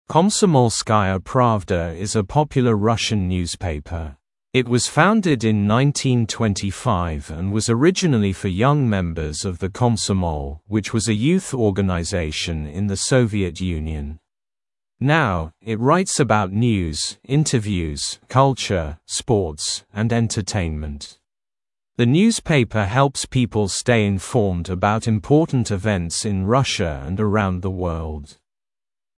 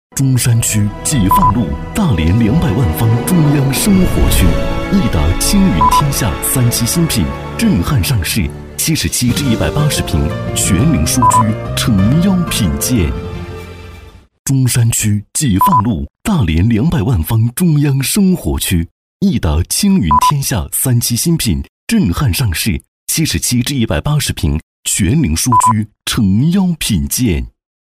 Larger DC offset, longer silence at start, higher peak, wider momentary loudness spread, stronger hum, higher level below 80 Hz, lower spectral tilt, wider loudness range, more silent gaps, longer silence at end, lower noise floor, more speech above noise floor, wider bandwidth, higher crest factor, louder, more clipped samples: neither; about the same, 0.1 s vs 0.15 s; about the same, 0 dBFS vs 0 dBFS; about the same, 9 LU vs 7 LU; neither; second, -40 dBFS vs -24 dBFS; about the same, -5.5 dB/octave vs -5 dB/octave; about the same, 3 LU vs 2 LU; second, none vs 14.39-14.45 s, 18.91-19.20 s, 21.69-21.87 s, 22.88-23.07 s, 24.63-24.83 s; first, 0.9 s vs 0.4 s; first, under -90 dBFS vs -36 dBFS; first, over 71 dB vs 23 dB; second, 12 kHz vs 16 kHz; first, 20 dB vs 12 dB; second, -20 LUFS vs -13 LUFS; neither